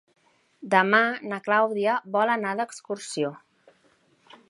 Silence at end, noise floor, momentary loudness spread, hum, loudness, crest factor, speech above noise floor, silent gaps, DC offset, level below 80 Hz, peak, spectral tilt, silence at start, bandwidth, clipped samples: 1.1 s; -64 dBFS; 12 LU; none; -24 LUFS; 24 dB; 39 dB; none; under 0.1%; -80 dBFS; -4 dBFS; -4.5 dB/octave; 0.6 s; 11.5 kHz; under 0.1%